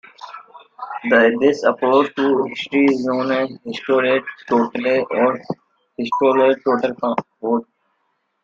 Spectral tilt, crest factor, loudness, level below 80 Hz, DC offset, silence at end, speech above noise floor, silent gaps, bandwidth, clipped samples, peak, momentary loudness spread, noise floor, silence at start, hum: -6 dB/octave; 16 dB; -18 LUFS; -64 dBFS; under 0.1%; 0.8 s; 51 dB; none; 7.6 kHz; under 0.1%; -2 dBFS; 17 LU; -69 dBFS; 0.2 s; none